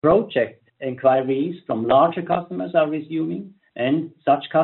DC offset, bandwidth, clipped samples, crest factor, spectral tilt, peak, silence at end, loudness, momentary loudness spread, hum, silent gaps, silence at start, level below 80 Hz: under 0.1%; 4.2 kHz; under 0.1%; 16 dB; -5.5 dB/octave; -4 dBFS; 0 s; -21 LUFS; 11 LU; none; none; 0.05 s; -58 dBFS